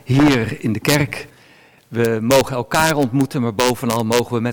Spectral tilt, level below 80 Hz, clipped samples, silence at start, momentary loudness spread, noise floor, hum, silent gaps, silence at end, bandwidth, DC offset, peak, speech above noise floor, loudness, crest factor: -5 dB/octave; -44 dBFS; under 0.1%; 0.05 s; 6 LU; -49 dBFS; none; none; 0 s; 19.5 kHz; under 0.1%; -2 dBFS; 32 dB; -17 LUFS; 16 dB